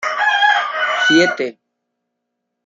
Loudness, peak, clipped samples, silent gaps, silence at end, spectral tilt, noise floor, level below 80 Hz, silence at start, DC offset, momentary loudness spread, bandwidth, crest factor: -14 LUFS; -2 dBFS; under 0.1%; none; 1.15 s; -3 dB/octave; -76 dBFS; -70 dBFS; 0 s; under 0.1%; 9 LU; 7.8 kHz; 16 dB